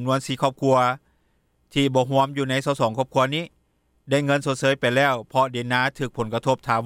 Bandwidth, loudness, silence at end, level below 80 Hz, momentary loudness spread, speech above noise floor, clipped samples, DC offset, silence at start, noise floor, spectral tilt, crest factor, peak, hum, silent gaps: 15.5 kHz; -22 LUFS; 0 s; -58 dBFS; 6 LU; 44 dB; under 0.1%; under 0.1%; 0 s; -66 dBFS; -5.5 dB/octave; 16 dB; -6 dBFS; none; none